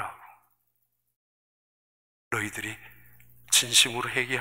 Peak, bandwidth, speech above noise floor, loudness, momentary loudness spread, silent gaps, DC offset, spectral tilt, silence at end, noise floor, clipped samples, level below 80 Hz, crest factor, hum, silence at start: -6 dBFS; 16 kHz; 49 dB; -24 LUFS; 18 LU; 1.16-2.31 s; under 0.1%; -0.5 dB/octave; 0 s; -76 dBFS; under 0.1%; -66 dBFS; 24 dB; 60 Hz at -65 dBFS; 0 s